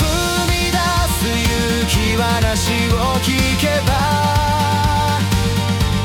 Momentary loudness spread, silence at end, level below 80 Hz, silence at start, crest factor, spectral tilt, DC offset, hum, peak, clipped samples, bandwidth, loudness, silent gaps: 1 LU; 0 s; -26 dBFS; 0 s; 12 dB; -4.5 dB/octave; under 0.1%; none; -4 dBFS; under 0.1%; 18 kHz; -16 LUFS; none